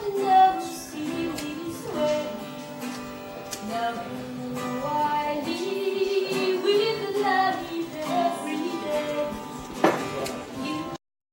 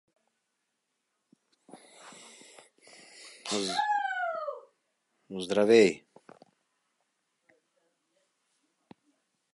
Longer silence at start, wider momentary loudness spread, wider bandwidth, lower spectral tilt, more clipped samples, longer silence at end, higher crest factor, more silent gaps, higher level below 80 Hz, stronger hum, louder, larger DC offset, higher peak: second, 0 s vs 1.75 s; second, 12 LU vs 28 LU; first, 16 kHz vs 11.5 kHz; about the same, -4 dB/octave vs -4 dB/octave; neither; second, 0.35 s vs 3.55 s; about the same, 22 dB vs 26 dB; neither; first, -60 dBFS vs -78 dBFS; neither; about the same, -27 LUFS vs -27 LUFS; neither; first, -4 dBFS vs -8 dBFS